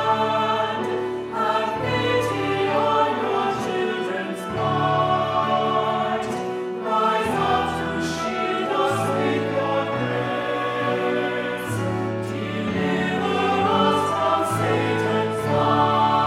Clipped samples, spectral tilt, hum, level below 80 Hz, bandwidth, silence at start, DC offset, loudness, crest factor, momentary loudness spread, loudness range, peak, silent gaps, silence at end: under 0.1%; -5.5 dB/octave; none; -54 dBFS; 16 kHz; 0 s; under 0.1%; -22 LUFS; 16 dB; 6 LU; 2 LU; -6 dBFS; none; 0 s